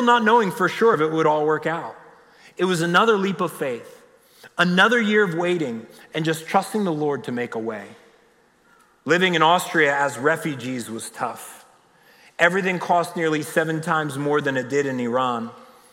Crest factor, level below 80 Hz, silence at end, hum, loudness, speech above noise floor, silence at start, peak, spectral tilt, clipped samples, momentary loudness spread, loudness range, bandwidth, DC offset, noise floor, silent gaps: 18 dB; -72 dBFS; 0.3 s; none; -21 LUFS; 37 dB; 0 s; -4 dBFS; -5 dB/octave; under 0.1%; 13 LU; 4 LU; 16.5 kHz; under 0.1%; -58 dBFS; none